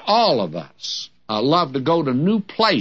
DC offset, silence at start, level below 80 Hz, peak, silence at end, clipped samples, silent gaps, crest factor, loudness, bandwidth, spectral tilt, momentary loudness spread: 0.2%; 0 s; -66 dBFS; -2 dBFS; 0 s; under 0.1%; none; 16 dB; -20 LUFS; 8 kHz; -5.5 dB/octave; 11 LU